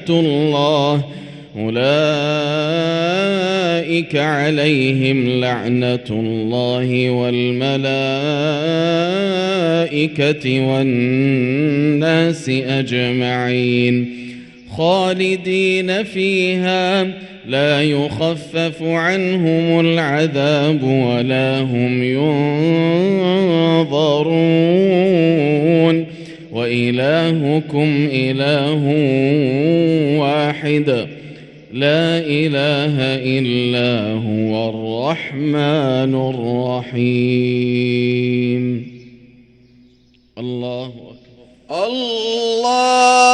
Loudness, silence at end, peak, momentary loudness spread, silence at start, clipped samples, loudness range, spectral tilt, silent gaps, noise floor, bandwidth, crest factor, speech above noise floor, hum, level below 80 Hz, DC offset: -16 LUFS; 0 s; 0 dBFS; 6 LU; 0 s; under 0.1%; 3 LU; -6 dB/octave; none; -52 dBFS; 11 kHz; 16 dB; 37 dB; none; -58 dBFS; under 0.1%